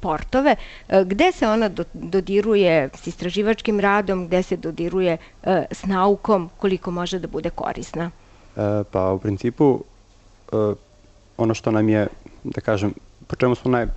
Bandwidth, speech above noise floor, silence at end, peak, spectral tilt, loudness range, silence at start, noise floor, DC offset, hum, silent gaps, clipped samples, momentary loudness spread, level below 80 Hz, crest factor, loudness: 8.4 kHz; 30 dB; 0 s; -6 dBFS; -6.5 dB/octave; 4 LU; 0 s; -51 dBFS; under 0.1%; none; none; under 0.1%; 10 LU; -42 dBFS; 16 dB; -21 LUFS